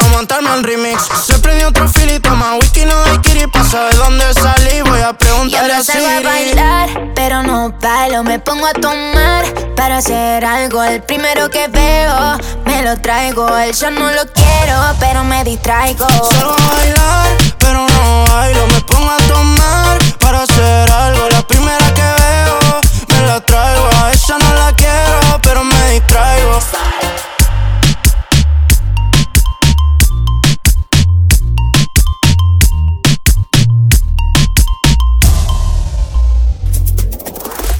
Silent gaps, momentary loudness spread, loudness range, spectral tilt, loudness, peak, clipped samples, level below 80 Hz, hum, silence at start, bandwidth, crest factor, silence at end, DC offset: none; 5 LU; 3 LU; -4 dB/octave; -10 LUFS; 0 dBFS; under 0.1%; -12 dBFS; none; 0 s; over 20 kHz; 10 dB; 0 s; under 0.1%